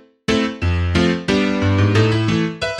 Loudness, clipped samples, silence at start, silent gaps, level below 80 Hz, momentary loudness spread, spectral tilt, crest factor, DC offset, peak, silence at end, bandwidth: -17 LUFS; under 0.1%; 0.3 s; none; -34 dBFS; 5 LU; -6.5 dB/octave; 14 dB; under 0.1%; -4 dBFS; 0 s; 10.5 kHz